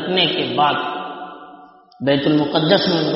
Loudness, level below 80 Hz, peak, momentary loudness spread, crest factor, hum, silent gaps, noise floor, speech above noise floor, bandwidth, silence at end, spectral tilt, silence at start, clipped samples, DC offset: -17 LUFS; -58 dBFS; 0 dBFS; 17 LU; 18 dB; none; none; -44 dBFS; 27 dB; 6 kHz; 0 s; -3 dB/octave; 0 s; under 0.1%; under 0.1%